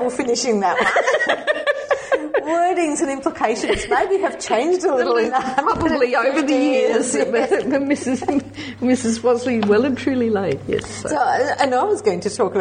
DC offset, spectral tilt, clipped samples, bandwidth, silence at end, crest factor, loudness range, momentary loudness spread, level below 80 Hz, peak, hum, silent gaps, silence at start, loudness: under 0.1%; -4 dB/octave; under 0.1%; 9.8 kHz; 0 s; 18 dB; 2 LU; 4 LU; -48 dBFS; -2 dBFS; none; none; 0 s; -19 LUFS